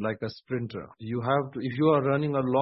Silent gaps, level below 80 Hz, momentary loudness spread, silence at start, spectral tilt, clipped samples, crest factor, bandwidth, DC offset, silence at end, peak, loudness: none; -64 dBFS; 12 LU; 0 s; -11 dB/octave; under 0.1%; 18 dB; 5.8 kHz; under 0.1%; 0 s; -10 dBFS; -28 LUFS